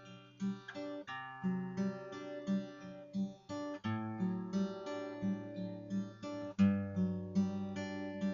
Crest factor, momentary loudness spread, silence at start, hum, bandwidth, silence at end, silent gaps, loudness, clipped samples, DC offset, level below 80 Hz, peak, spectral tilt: 20 dB; 9 LU; 0 s; none; 7.2 kHz; 0 s; none; -40 LUFS; under 0.1%; under 0.1%; -76 dBFS; -20 dBFS; -7 dB/octave